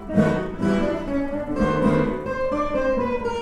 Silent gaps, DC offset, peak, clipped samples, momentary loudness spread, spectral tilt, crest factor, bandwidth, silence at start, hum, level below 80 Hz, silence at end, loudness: none; under 0.1%; -6 dBFS; under 0.1%; 6 LU; -7.5 dB/octave; 16 dB; 11 kHz; 0 s; none; -36 dBFS; 0 s; -23 LUFS